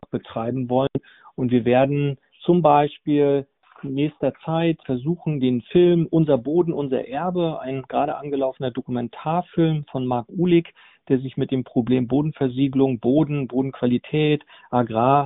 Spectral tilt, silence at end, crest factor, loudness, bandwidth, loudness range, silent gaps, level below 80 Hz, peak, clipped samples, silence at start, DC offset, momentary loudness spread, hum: -7 dB/octave; 0 s; 18 dB; -22 LUFS; 4 kHz; 3 LU; none; -56 dBFS; -2 dBFS; under 0.1%; 0.15 s; under 0.1%; 9 LU; none